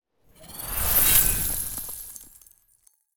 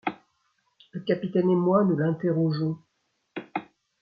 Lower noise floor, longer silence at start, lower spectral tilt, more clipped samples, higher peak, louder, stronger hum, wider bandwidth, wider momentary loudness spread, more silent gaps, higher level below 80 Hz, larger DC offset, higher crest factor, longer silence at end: second, -63 dBFS vs -75 dBFS; about the same, 0 s vs 0.05 s; second, -1 dB/octave vs -10.5 dB/octave; neither; first, -4 dBFS vs -10 dBFS; first, -20 LUFS vs -26 LUFS; neither; first, over 20 kHz vs 5.2 kHz; first, 23 LU vs 18 LU; neither; first, -38 dBFS vs -70 dBFS; neither; first, 22 dB vs 16 dB; second, 0 s vs 0.4 s